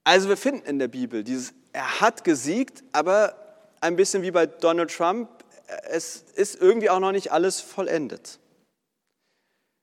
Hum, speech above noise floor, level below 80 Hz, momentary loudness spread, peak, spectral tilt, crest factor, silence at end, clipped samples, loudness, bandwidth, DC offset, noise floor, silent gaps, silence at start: none; 56 dB; -88 dBFS; 12 LU; -2 dBFS; -3.5 dB/octave; 22 dB; 1.5 s; under 0.1%; -24 LUFS; 14.5 kHz; under 0.1%; -79 dBFS; none; 0.05 s